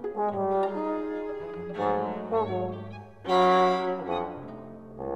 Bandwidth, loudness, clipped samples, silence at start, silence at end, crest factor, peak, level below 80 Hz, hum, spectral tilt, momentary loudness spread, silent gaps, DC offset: 10.5 kHz; -28 LUFS; under 0.1%; 0 s; 0 s; 18 dB; -12 dBFS; -62 dBFS; none; -6.5 dB/octave; 18 LU; none; 0.1%